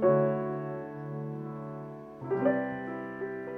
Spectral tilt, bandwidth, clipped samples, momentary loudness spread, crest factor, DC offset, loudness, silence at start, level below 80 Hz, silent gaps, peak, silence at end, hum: -10.5 dB/octave; 3.7 kHz; under 0.1%; 13 LU; 18 dB; under 0.1%; -33 LUFS; 0 s; -70 dBFS; none; -14 dBFS; 0 s; none